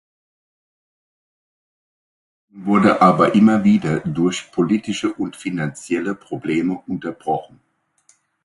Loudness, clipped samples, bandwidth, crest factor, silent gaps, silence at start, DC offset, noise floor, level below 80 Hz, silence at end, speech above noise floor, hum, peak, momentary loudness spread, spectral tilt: -18 LUFS; under 0.1%; 11.5 kHz; 20 dB; none; 2.55 s; under 0.1%; -59 dBFS; -56 dBFS; 1 s; 41 dB; none; 0 dBFS; 13 LU; -6.5 dB/octave